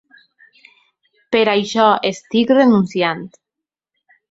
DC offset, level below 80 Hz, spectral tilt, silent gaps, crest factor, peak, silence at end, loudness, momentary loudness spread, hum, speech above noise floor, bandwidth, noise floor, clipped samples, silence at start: under 0.1%; -62 dBFS; -5.5 dB/octave; none; 16 dB; -2 dBFS; 1.05 s; -15 LUFS; 8 LU; none; 69 dB; 8 kHz; -84 dBFS; under 0.1%; 1.3 s